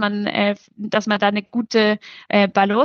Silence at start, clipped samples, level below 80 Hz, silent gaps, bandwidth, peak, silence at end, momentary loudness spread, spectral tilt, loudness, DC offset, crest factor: 0 s; under 0.1%; -68 dBFS; none; 7 kHz; -2 dBFS; 0 s; 7 LU; -5.5 dB/octave; -19 LUFS; under 0.1%; 16 dB